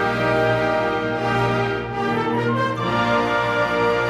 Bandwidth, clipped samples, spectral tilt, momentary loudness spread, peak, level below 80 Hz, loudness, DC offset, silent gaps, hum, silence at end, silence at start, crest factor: 13 kHz; under 0.1%; -6.5 dB/octave; 3 LU; -8 dBFS; -46 dBFS; -20 LUFS; under 0.1%; none; none; 0 s; 0 s; 12 dB